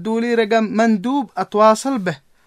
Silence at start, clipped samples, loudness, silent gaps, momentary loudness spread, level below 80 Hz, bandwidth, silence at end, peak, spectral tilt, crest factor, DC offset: 0 s; under 0.1%; -17 LUFS; none; 8 LU; -64 dBFS; 14 kHz; 0.3 s; -2 dBFS; -5.5 dB/octave; 16 dB; under 0.1%